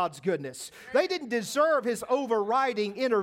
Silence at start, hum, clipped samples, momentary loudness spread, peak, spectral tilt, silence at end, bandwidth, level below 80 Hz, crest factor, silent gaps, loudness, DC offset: 0 s; none; under 0.1%; 7 LU; -12 dBFS; -4 dB/octave; 0 s; 16.5 kHz; -74 dBFS; 16 dB; none; -28 LUFS; under 0.1%